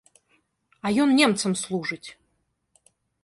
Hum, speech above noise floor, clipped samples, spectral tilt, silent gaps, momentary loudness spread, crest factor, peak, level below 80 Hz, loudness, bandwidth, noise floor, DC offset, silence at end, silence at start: none; 51 dB; under 0.1%; -4 dB/octave; none; 17 LU; 20 dB; -6 dBFS; -68 dBFS; -23 LUFS; 11.5 kHz; -73 dBFS; under 0.1%; 1.1 s; 0.85 s